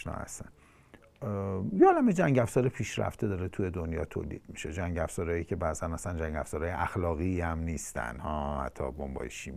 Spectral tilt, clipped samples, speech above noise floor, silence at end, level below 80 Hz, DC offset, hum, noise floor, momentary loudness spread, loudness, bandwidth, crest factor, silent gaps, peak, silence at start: -6.5 dB/octave; under 0.1%; 27 dB; 0 s; -48 dBFS; under 0.1%; none; -58 dBFS; 13 LU; -31 LUFS; 15 kHz; 22 dB; none; -10 dBFS; 0 s